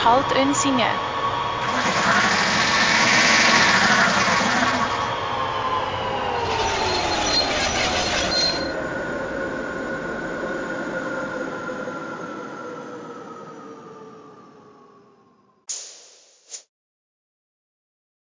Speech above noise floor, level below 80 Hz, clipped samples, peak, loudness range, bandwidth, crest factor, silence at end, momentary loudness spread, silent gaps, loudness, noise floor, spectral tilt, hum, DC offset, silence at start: 39 dB; -46 dBFS; under 0.1%; -4 dBFS; 22 LU; 7.8 kHz; 20 dB; 1.65 s; 21 LU; none; -20 LUFS; -57 dBFS; -2.5 dB/octave; none; under 0.1%; 0 s